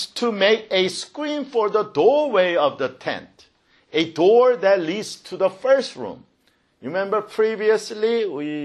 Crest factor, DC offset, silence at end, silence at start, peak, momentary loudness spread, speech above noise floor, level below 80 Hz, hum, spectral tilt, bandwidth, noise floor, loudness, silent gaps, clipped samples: 16 dB; under 0.1%; 0 s; 0 s; -4 dBFS; 12 LU; 43 dB; -70 dBFS; none; -4 dB/octave; 12 kHz; -63 dBFS; -20 LUFS; none; under 0.1%